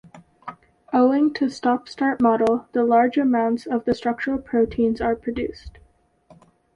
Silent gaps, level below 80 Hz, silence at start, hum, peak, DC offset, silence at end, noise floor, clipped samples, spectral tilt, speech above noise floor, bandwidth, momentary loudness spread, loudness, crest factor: none; -50 dBFS; 0.15 s; none; -6 dBFS; under 0.1%; 1.05 s; -58 dBFS; under 0.1%; -6.5 dB/octave; 38 dB; 9 kHz; 11 LU; -21 LUFS; 16 dB